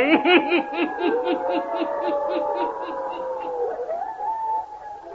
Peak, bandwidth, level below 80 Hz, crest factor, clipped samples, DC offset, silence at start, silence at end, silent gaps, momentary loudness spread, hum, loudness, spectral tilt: -4 dBFS; 7 kHz; -62 dBFS; 20 dB; under 0.1%; under 0.1%; 0 s; 0 s; none; 12 LU; none; -24 LUFS; -5.5 dB/octave